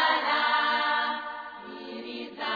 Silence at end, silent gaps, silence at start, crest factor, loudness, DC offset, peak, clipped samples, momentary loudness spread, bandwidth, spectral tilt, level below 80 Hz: 0 s; none; 0 s; 16 dB; -26 LUFS; under 0.1%; -12 dBFS; under 0.1%; 16 LU; 5 kHz; -3 dB/octave; -72 dBFS